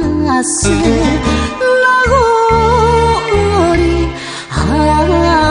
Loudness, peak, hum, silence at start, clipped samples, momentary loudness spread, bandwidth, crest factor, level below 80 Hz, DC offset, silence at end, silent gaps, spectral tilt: -11 LUFS; 0 dBFS; none; 0 s; under 0.1%; 6 LU; 10.5 kHz; 10 dB; -22 dBFS; under 0.1%; 0 s; none; -5 dB/octave